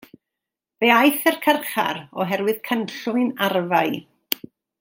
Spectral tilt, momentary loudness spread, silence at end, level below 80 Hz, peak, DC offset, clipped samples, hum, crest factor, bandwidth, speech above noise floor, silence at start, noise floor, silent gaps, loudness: -4 dB/octave; 12 LU; 0.45 s; -74 dBFS; 0 dBFS; under 0.1%; under 0.1%; none; 22 dB; 17 kHz; 65 dB; 0.8 s; -85 dBFS; none; -21 LUFS